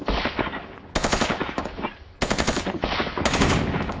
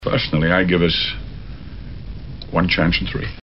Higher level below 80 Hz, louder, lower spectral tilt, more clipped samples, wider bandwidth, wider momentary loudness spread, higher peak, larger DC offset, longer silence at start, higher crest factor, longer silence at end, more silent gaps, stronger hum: about the same, -34 dBFS vs -32 dBFS; second, -25 LUFS vs -18 LUFS; about the same, -4.5 dB/octave vs -4 dB/octave; neither; first, 8 kHz vs 6 kHz; second, 10 LU vs 19 LU; about the same, -4 dBFS vs -2 dBFS; second, under 0.1% vs 1%; about the same, 0 s vs 0 s; about the same, 22 dB vs 18 dB; about the same, 0 s vs 0 s; neither; neither